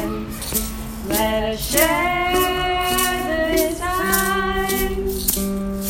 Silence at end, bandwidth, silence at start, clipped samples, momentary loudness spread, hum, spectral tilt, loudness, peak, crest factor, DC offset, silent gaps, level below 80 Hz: 0 s; 17 kHz; 0 s; under 0.1%; 6 LU; none; -3 dB/octave; -20 LUFS; 0 dBFS; 20 dB; under 0.1%; none; -32 dBFS